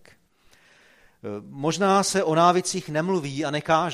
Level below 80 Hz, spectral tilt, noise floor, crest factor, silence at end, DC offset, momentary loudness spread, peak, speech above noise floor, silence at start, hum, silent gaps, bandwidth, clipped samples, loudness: -64 dBFS; -4.5 dB/octave; -59 dBFS; 20 dB; 0 s; under 0.1%; 17 LU; -6 dBFS; 36 dB; 1.25 s; none; none; 14.5 kHz; under 0.1%; -23 LUFS